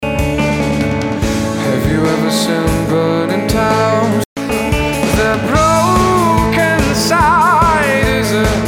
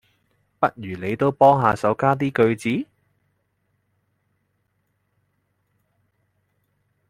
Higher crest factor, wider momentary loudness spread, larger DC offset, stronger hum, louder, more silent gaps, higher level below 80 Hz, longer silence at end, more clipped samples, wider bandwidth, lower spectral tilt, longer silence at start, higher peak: second, 12 dB vs 22 dB; second, 6 LU vs 12 LU; neither; neither; first, -13 LUFS vs -20 LUFS; first, 4.26-4.36 s vs none; first, -26 dBFS vs -60 dBFS; second, 0 s vs 4.25 s; neither; first, 17.5 kHz vs 15.5 kHz; second, -5 dB/octave vs -7.5 dB/octave; second, 0 s vs 0.6 s; about the same, 0 dBFS vs -2 dBFS